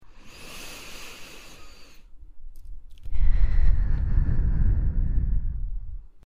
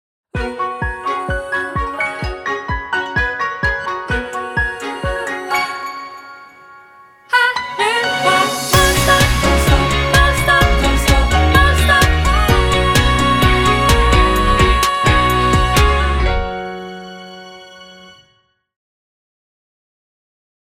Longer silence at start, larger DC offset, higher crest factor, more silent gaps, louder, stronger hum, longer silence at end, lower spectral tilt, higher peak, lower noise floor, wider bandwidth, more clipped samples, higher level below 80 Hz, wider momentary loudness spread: second, 0.05 s vs 0.35 s; neither; about the same, 16 dB vs 16 dB; neither; second, -29 LUFS vs -15 LUFS; neither; second, 0.25 s vs 2.85 s; first, -6 dB/octave vs -4 dB/octave; second, -6 dBFS vs 0 dBFS; second, -43 dBFS vs -59 dBFS; second, 11.5 kHz vs 18 kHz; neither; about the same, -26 dBFS vs -22 dBFS; first, 22 LU vs 12 LU